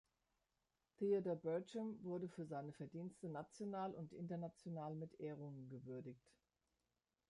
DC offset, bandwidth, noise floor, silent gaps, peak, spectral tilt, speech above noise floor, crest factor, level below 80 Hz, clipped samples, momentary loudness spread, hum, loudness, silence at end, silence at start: under 0.1%; 11 kHz; under -90 dBFS; none; -30 dBFS; -8 dB/octave; over 42 dB; 18 dB; -86 dBFS; under 0.1%; 12 LU; none; -48 LUFS; 1.1 s; 1 s